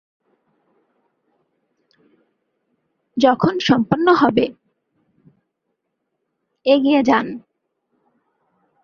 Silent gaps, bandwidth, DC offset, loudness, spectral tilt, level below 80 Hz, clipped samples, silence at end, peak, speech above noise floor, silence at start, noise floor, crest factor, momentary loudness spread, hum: none; 7 kHz; under 0.1%; -17 LUFS; -6 dB/octave; -58 dBFS; under 0.1%; 1.45 s; -2 dBFS; 60 dB; 3.15 s; -75 dBFS; 20 dB; 12 LU; none